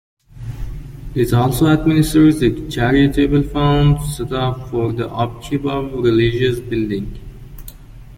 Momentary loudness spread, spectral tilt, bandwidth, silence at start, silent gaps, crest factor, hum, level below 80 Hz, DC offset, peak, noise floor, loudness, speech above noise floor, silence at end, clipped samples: 18 LU; -7 dB/octave; 16.5 kHz; 0.35 s; none; 14 dB; none; -30 dBFS; under 0.1%; -2 dBFS; -36 dBFS; -16 LUFS; 21 dB; 0 s; under 0.1%